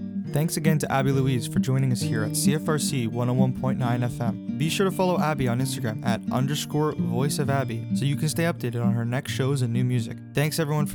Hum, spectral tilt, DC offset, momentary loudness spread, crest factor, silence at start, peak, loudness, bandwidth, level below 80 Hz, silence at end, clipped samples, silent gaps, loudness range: none; -6 dB/octave; under 0.1%; 4 LU; 16 dB; 0 s; -8 dBFS; -25 LUFS; 19 kHz; -54 dBFS; 0 s; under 0.1%; none; 2 LU